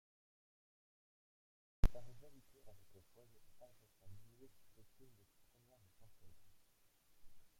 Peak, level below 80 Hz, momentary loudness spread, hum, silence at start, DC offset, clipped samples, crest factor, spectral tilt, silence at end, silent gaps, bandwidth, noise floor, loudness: -18 dBFS; -50 dBFS; 25 LU; none; 1.85 s; under 0.1%; under 0.1%; 28 dB; -6.5 dB/octave; 0.2 s; none; 15 kHz; -73 dBFS; -45 LUFS